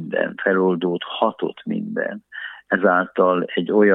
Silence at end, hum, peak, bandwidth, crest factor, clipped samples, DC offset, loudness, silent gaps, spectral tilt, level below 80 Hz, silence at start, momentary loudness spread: 0 s; none; -2 dBFS; 4 kHz; 18 dB; under 0.1%; under 0.1%; -21 LUFS; none; -9 dB/octave; -74 dBFS; 0 s; 11 LU